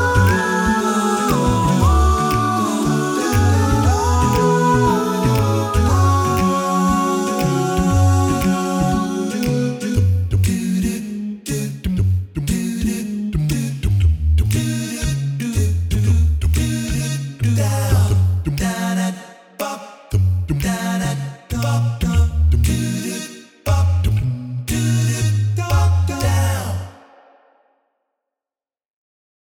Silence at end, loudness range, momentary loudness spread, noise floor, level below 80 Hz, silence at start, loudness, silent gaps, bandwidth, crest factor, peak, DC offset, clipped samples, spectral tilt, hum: 2.5 s; 5 LU; 8 LU; under -90 dBFS; -26 dBFS; 0 s; -18 LUFS; none; 18.5 kHz; 14 dB; -4 dBFS; under 0.1%; under 0.1%; -6 dB/octave; none